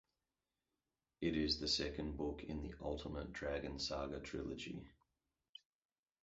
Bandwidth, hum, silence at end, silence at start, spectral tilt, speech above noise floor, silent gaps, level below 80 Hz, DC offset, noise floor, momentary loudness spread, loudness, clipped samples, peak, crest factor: 7.6 kHz; none; 1.3 s; 1.2 s; -3.5 dB/octave; over 47 dB; none; -56 dBFS; under 0.1%; under -90 dBFS; 15 LU; -43 LUFS; under 0.1%; -26 dBFS; 20 dB